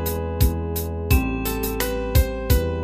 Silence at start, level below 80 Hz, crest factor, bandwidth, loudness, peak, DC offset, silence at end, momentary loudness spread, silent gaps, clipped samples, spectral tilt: 0 s; -24 dBFS; 18 dB; 15.5 kHz; -23 LUFS; -4 dBFS; under 0.1%; 0 s; 5 LU; none; under 0.1%; -5.5 dB/octave